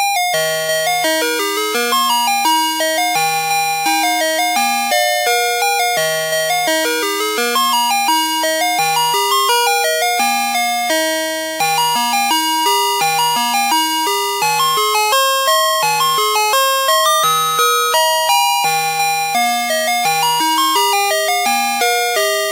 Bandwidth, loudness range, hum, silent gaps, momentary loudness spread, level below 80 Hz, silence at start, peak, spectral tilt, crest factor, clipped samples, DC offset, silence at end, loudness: 16 kHz; 2 LU; none; none; 3 LU; -80 dBFS; 0 s; 0 dBFS; 0 dB/octave; 16 dB; under 0.1%; under 0.1%; 0 s; -14 LUFS